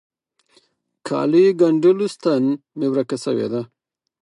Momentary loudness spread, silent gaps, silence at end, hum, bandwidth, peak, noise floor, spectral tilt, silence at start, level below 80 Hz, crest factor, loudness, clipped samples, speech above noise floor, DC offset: 12 LU; none; 0.6 s; none; 11 kHz; -4 dBFS; -60 dBFS; -7 dB/octave; 1.05 s; -74 dBFS; 16 dB; -19 LUFS; under 0.1%; 43 dB; under 0.1%